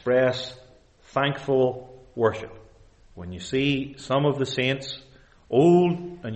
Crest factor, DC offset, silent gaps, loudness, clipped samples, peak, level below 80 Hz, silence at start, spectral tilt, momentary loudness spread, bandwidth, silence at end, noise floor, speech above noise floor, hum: 16 dB; under 0.1%; none; -24 LUFS; under 0.1%; -8 dBFS; -56 dBFS; 0.05 s; -6.5 dB/octave; 20 LU; 8.4 kHz; 0 s; -54 dBFS; 30 dB; none